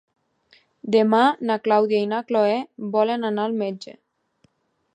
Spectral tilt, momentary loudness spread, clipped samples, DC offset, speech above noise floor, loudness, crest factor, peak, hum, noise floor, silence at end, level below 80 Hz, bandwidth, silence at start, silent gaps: -6.5 dB/octave; 11 LU; under 0.1%; under 0.1%; 44 dB; -21 LUFS; 18 dB; -6 dBFS; none; -65 dBFS; 1.05 s; -76 dBFS; 9.4 kHz; 0.85 s; none